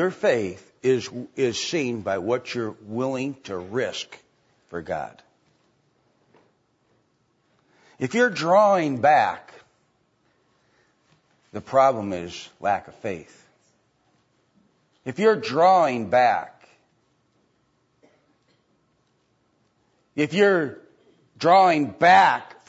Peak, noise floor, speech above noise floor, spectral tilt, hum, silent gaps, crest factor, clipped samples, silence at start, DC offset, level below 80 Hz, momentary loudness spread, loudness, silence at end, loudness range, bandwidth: -4 dBFS; -68 dBFS; 46 dB; -5 dB/octave; none; none; 20 dB; under 0.1%; 0 s; under 0.1%; -68 dBFS; 18 LU; -22 LUFS; 0.25 s; 12 LU; 8 kHz